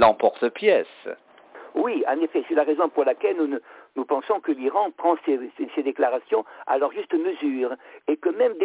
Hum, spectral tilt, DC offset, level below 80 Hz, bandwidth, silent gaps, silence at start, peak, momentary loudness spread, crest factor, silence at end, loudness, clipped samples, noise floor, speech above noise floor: none; -8.5 dB/octave; under 0.1%; -62 dBFS; 4 kHz; none; 0 s; -6 dBFS; 10 LU; 16 dB; 0 s; -24 LUFS; under 0.1%; -46 dBFS; 23 dB